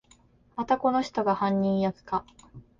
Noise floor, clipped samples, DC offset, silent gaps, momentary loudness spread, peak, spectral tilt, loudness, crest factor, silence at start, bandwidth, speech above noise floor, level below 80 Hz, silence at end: -60 dBFS; under 0.1%; under 0.1%; none; 8 LU; -12 dBFS; -7 dB/octave; -27 LUFS; 16 dB; 0.55 s; 7.4 kHz; 33 dB; -60 dBFS; 0.2 s